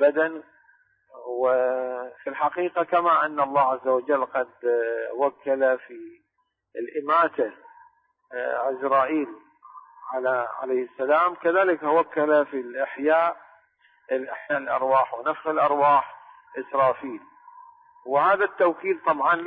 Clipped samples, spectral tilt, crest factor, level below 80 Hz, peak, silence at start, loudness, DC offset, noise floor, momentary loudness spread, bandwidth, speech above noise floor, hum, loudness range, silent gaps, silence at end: under 0.1%; -9 dB/octave; 16 dB; -78 dBFS; -8 dBFS; 0 s; -24 LUFS; under 0.1%; -75 dBFS; 13 LU; 4.9 kHz; 52 dB; none; 4 LU; none; 0 s